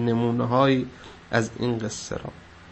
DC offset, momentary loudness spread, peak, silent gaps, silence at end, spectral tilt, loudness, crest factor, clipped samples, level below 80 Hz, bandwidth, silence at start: under 0.1%; 15 LU; -6 dBFS; none; 0 s; -6 dB/octave; -25 LUFS; 18 dB; under 0.1%; -52 dBFS; 8.6 kHz; 0 s